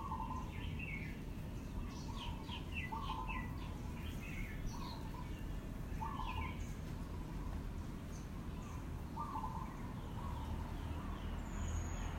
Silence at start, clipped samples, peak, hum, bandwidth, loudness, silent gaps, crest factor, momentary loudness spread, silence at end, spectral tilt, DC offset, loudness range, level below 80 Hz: 0 s; under 0.1%; -30 dBFS; none; 16 kHz; -46 LUFS; none; 14 dB; 4 LU; 0 s; -6 dB/octave; under 0.1%; 1 LU; -48 dBFS